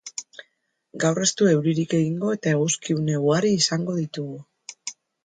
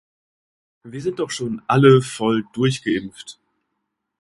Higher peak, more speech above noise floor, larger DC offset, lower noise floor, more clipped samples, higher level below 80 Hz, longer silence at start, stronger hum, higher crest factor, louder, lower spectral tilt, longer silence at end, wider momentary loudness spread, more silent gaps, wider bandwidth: second, -6 dBFS vs 0 dBFS; second, 47 dB vs 58 dB; neither; second, -69 dBFS vs -77 dBFS; neither; second, -66 dBFS vs -58 dBFS; second, 0.05 s vs 0.85 s; neither; about the same, 18 dB vs 20 dB; second, -22 LUFS vs -19 LUFS; second, -4.5 dB/octave vs -6 dB/octave; second, 0.35 s vs 0.9 s; second, 16 LU vs 23 LU; neither; second, 9.6 kHz vs 11.5 kHz